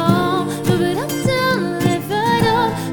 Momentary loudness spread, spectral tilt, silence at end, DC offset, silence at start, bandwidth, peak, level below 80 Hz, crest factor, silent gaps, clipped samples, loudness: 4 LU; -5.5 dB/octave; 0 s; under 0.1%; 0 s; over 20 kHz; -2 dBFS; -44 dBFS; 14 dB; none; under 0.1%; -18 LUFS